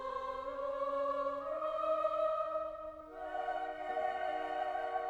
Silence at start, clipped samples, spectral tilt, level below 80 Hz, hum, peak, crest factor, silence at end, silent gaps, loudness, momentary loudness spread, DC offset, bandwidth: 0 s; under 0.1%; -4.5 dB/octave; -66 dBFS; none; -22 dBFS; 14 dB; 0 s; none; -38 LUFS; 8 LU; under 0.1%; 9.6 kHz